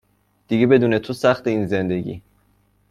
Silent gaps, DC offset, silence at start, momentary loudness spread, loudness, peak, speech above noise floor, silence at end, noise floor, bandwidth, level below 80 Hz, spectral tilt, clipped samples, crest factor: none; under 0.1%; 0.5 s; 12 LU; -19 LUFS; -2 dBFS; 42 dB; 0.7 s; -61 dBFS; 13.5 kHz; -54 dBFS; -7.5 dB/octave; under 0.1%; 18 dB